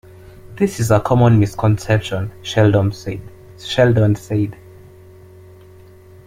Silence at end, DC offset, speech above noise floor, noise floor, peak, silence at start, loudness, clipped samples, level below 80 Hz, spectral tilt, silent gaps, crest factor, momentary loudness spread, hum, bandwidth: 1.75 s; under 0.1%; 27 dB; -43 dBFS; -2 dBFS; 0.45 s; -17 LUFS; under 0.1%; -44 dBFS; -7 dB/octave; none; 16 dB; 12 LU; none; 15.5 kHz